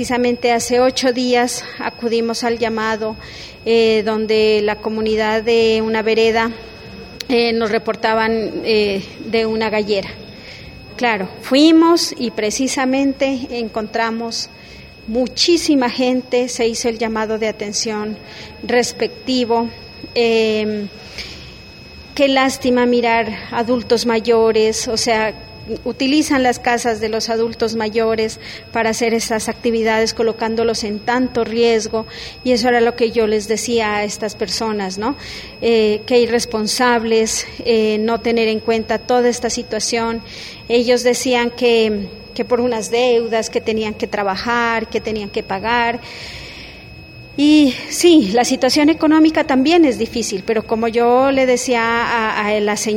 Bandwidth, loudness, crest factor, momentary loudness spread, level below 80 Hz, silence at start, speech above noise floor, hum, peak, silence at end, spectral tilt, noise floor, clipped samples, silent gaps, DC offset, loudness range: 16.5 kHz; -16 LUFS; 16 dB; 14 LU; -46 dBFS; 0 s; 21 dB; none; 0 dBFS; 0 s; -3.5 dB/octave; -37 dBFS; under 0.1%; none; under 0.1%; 5 LU